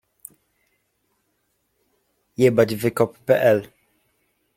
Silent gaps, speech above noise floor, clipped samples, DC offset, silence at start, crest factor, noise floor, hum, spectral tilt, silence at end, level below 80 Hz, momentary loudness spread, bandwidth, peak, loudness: none; 52 dB; under 0.1%; under 0.1%; 2.4 s; 20 dB; -71 dBFS; none; -6.5 dB/octave; 0.9 s; -62 dBFS; 26 LU; 16.5 kHz; -4 dBFS; -20 LUFS